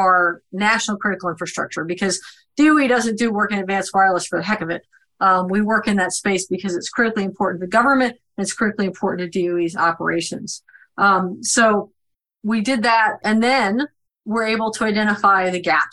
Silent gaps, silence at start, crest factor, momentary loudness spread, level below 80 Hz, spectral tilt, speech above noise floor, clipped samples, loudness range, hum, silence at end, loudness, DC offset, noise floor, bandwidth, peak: none; 0 s; 16 dB; 10 LU; -58 dBFS; -4 dB/octave; 52 dB; under 0.1%; 2 LU; none; 0 s; -19 LUFS; under 0.1%; -71 dBFS; 12.5 kHz; -2 dBFS